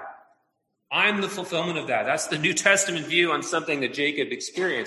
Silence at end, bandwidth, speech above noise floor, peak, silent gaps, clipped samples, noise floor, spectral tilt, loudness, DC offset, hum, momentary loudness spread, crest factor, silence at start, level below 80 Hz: 0 s; 12.5 kHz; 50 dB; -4 dBFS; none; under 0.1%; -75 dBFS; -2.5 dB/octave; -23 LUFS; under 0.1%; none; 8 LU; 22 dB; 0 s; -70 dBFS